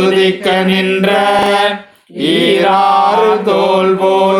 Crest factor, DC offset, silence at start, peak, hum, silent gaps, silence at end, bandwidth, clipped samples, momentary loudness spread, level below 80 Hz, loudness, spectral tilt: 10 dB; under 0.1%; 0 s; 0 dBFS; none; none; 0 s; 13.5 kHz; under 0.1%; 5 LU; -52 dBFS; -11 LUFS; -5.5 dB/octave